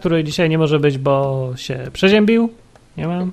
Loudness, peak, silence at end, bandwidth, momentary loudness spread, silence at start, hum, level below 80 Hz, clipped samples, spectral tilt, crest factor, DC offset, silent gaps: -17 LUFS; -2 dBFS; 0 s; 13.5 kHz; 12 LU; 0 s; none; -46 dBFS; under 0.1%; -6.5 dB/octave; 14 dB; under 0.1%; none